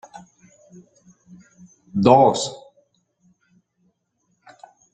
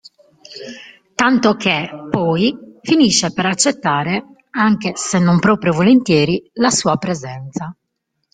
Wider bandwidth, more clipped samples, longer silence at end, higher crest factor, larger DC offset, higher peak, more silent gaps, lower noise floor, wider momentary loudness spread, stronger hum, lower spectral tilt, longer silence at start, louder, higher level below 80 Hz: about the same, 9.6 kHz vs 9.6 kHz; neither; first, 2.35 s vs 0.6 s; first, 22 dB vs 16 dB; neither; about the same, -2 dBFS vs 0 dBFS; neither; about the same, -70 dBFS vs -73 dBFS; about the same, 17 LU vs 17 LU; neither; about the same, -5.5 dB/octave vs -4.5 dB/octave; first, 1.95 s vs 0.5 s; about the same, -17 LUFS vs -15 LUFS; second, -60 dBFS vs -52 dBFS